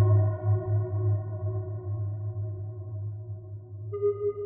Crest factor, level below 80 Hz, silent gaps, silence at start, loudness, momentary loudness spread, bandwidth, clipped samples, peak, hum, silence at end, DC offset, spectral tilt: 16 dB; -56 dBFS; none; 0 s; -30 LUFS; 13 LU; 2.1 kHz; under 0.1%; -14 dBFS; none; 0 s; under 0.1%; -13.5 dB/octave